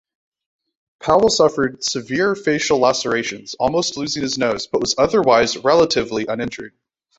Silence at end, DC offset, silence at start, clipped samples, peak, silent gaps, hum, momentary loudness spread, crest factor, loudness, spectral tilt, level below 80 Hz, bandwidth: 0.5 s; under 0.1%; 1 s; under 0.1%; -2 dBFS; none; none; 9 LU; 18 dB; -18 LUFS; -3.5 dB/octave; -50 dBFS; 8.2 kHz